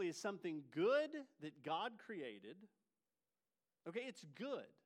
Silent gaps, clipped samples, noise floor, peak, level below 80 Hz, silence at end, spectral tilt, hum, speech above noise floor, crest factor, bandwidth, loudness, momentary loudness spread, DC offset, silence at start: none; under 0.1%; under -90 dBFS; -28 dBFS; under -90 dBFS; 0.15 s; -4.5 dB/octave; none; over 45 dB; 18 dB; 14.5 kHz; -45 LUFS; 18 LU; under 0.1%; 0 s